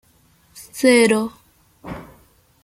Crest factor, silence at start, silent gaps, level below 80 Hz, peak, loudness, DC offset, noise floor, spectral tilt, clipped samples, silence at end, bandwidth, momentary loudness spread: 20 dB; 0.55 s; none; -54 dBFS; -2 dBFS; -16 LUFS; under 0.1%; -56 dBFS; -4 dB/octave; under 0.1%; 0.6 s; 16 kHz; 22 LU